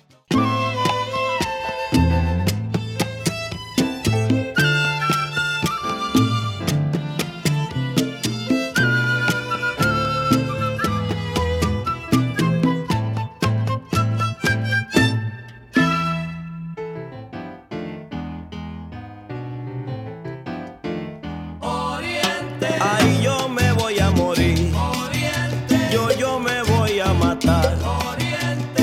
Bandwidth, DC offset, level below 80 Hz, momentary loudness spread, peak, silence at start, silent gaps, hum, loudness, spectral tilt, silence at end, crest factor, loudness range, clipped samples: 16.5 kHz; under 0.1%; -36 dBFS; 13 LU; -4 dBFS; 0.3 s; none; none; -21 LUFS; -5.5 dB/octave; 0 s; 18 dB; 12 LU; under 0.1%